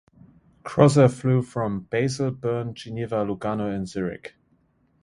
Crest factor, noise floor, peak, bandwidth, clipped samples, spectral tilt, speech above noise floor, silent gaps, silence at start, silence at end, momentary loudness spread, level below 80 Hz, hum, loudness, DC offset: 22 dB; -64 dBFS; -2 dBFS; 11.5 kHz; under 0.1%; -7 dB/octave; 42 dB; none; 0.65 s; 0.75 s; 14 LU; -56 dBFS; none; -24 LUFS; under 0.1%